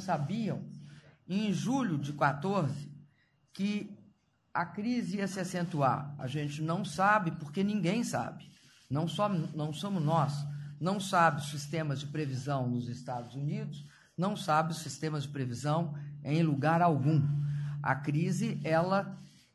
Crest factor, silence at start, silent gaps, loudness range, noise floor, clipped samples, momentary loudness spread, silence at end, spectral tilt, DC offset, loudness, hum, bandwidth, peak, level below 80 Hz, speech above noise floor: 20 dB; 0 s; none; 4 LU; -68 dBFS; under 0.1%; 12 LU; 0.25 s; -6.5 dB/octave; under 0.1%; -32 LUFS; none; 12.5 kHz; -12 dBFS; -68 dBFS; 37 dB